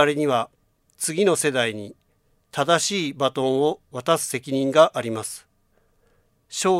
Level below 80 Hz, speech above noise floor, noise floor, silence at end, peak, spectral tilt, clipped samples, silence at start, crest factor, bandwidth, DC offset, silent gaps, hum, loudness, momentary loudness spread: -68 dBFS; 43 dB; -65 dBFS; 0 s; -2 dBFS; -3.5 dB/octave; under 0.1%; 0 s; 22 dB; 16 kHz; under 0.1%; none; none; -22 LUFS; 15 LU